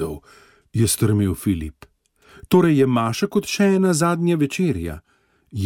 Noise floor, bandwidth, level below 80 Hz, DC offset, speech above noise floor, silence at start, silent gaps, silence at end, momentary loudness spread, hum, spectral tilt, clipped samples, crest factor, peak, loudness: -52 dBFS; 17 kHz; -44 dBFS; under 0.1%; 33 dB; 0 s; none; 0 s; 15 LU; none; -6 dB/octave; under 0.1%; 16 dB; -4 dBFS; -19 LUFS